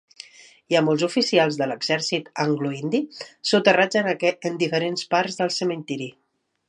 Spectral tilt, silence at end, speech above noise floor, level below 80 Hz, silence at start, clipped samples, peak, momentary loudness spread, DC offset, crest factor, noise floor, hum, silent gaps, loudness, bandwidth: -4.5 dB/octave; 0.6 s; 24 dB; -74 dBFS; 0.7 s; under 0.1%; -2 dBFS; 12 LU; under 0.1%; 20 dB; -46 dBFS; none; none; -22 LUFS; 11 kHz